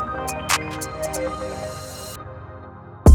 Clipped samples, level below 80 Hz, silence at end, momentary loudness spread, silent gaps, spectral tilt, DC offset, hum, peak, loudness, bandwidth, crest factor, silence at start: under 0.1%; -32 dBFS; 0 s; 17 LU; none; -5 dB/octave; under 0.1%; none; -2 dBFS; -26 LUFS; 19.5 kHz; 20 dB; 0 s